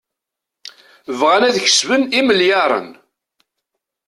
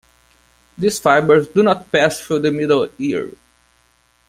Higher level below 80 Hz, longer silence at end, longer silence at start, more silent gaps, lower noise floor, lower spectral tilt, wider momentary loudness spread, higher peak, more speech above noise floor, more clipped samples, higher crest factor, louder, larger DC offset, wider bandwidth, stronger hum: second, -62 dBFS vs -56 dBFS; first, 1.15 s vs 0.95 s; first, 1.1 s vs 0.8 s; neither; first, -82 dBFS vs -58 dBFS; second, -1.5 dB/octave vs -5 dB/octave; second, 6 LU vs 9 LU; about the same, -2 dBFS vs -2 dBFS; first, 68 dB vs 43 dB; neither; about the same, 16 dB vs 16 dB; about the same, -14 LUFS vs -16 LUFS; neither; second, 12.5 kHz vs 16 kHz; neither